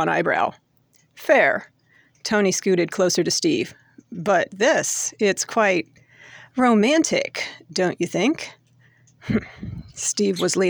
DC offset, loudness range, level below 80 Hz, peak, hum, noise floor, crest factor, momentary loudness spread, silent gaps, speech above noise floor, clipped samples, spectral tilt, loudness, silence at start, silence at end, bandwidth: under 0.1%; 3 LU; -56 dBFS; -4 dBFS; none; -61 dBFS; 18 dB; 14 LU; none; 40 dB; under 0.1%; -3.5 dB/octave; -21 LUFS; 0 s; 0 s; over 20 kHz